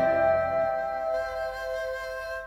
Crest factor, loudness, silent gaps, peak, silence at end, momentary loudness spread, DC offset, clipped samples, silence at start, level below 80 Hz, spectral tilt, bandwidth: 14 dB; -28 LUFS; none; -14 dBFS; 0 s; 9 LU; under 0.1%; under 0.1%; 0 s; -52 dBFS; -5 dB/octave; 14.5 kHz